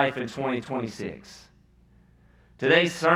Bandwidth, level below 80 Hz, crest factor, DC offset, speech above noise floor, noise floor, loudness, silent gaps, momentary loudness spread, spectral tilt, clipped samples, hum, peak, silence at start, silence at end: 14.5 kHz; -62 dBFS; 22 dB; under 0.1%; 33 dB; -58 dBFS; -26 LUFS; none; 19 LU; -5 dB/octave; under 0.1%; none; -4 dBFS; 0 s; 0 s